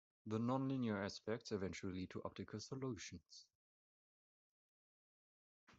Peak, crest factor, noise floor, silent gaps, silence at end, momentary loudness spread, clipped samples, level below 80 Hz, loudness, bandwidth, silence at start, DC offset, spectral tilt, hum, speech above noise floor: -28 dBFS; 20 dB; under -90 dBFS; 3.55-5.67 s; 0.05 s; 12 LU; under 0.1%; -80 dBFS; -46 LUFS; 8 kHz; 0.25 s; under 0.1%; -6 dB/octave; none; over 45 dB